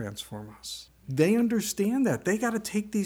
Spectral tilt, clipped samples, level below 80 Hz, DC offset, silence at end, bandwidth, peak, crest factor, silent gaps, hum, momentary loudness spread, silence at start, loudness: -5 dB/octave; under 0.1%; -62 dBFS; under 0.1%; 0 s; 19.5 kHz; -10 dBFS; 16 dB; none; none; 15 LU; 0 s; -27 LUFS